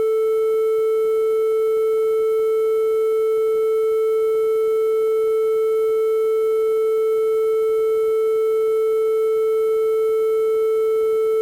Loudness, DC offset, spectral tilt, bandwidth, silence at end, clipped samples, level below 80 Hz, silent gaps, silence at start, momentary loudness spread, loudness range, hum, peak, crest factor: -19 LUFS; under 0.1%; -3.5 dB/octave; 16.5 kHz; 0 s; under 0.1%; -66 dBFS; none; 0 s; 0 LU; 0 LU; none; -12 dBFS; 6 dB